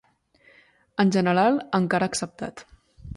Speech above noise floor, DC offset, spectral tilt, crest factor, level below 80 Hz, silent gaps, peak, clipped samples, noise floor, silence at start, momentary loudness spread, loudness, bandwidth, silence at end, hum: 37 dB; under 0.1%; -5.5 dB/octave; 18 dB; -54 dBFS; none; -8 dBFS; under 0.1%; -60 dBFS; 1 s; 15 LU; -23 LUFS; 11.5 kHz; 0 s; none